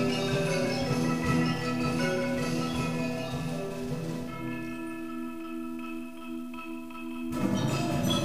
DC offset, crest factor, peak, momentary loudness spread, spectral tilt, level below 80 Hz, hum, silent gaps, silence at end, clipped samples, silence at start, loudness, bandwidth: 0.5%; 16 dB; -14 dBFS; 11 LU; -5.5 dB/octave; -52 dBFS; none; none; 0 s; under 0.1%; 0 s; -31 LUFS; 15.5 kHz